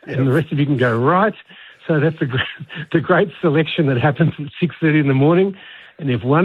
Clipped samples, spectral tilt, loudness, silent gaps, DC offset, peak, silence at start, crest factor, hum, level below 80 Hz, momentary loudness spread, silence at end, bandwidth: under 0.1%; -9 dB/octave; -17 LUFS; none; under 0.1%; -2 dBFS; 0.05 s; 16 dB; none; -54 dBFS; 9 LU; 0 s; 4.5 kHz